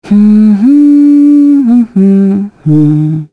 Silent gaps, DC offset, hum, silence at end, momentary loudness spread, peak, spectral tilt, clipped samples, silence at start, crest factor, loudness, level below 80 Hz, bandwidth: none; under 0.1%; none; 0.05 s; 6 LU; 0 dBFS; -10.5 dB/octave; under 0.1%; 0.05 s; 6 dB; -6 LUFS; -50 dBFS; 4.6 kHz